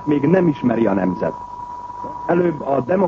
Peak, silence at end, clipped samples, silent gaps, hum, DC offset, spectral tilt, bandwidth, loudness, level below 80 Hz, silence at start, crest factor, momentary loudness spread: -4 dBFS; 0 s; under 0.1%; none; 50 Hz at -45 dBFS; under 0.1%; -9.5 dB/octave; 7 kHz; -18 LUFS; -50 dBFS; 0 s; 16 dB; 15 LU